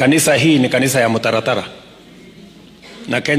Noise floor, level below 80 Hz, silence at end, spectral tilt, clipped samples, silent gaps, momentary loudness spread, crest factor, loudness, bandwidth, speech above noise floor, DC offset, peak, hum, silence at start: -41 dBFS; -54 dBFS; 0 s; -4 dB/octave; under 0.1%; none; 11 LU; 14 dB; -14 LUFS; 15.5 kHz; 26 dB; under 0.1%; -4 dBFS; none; 0 s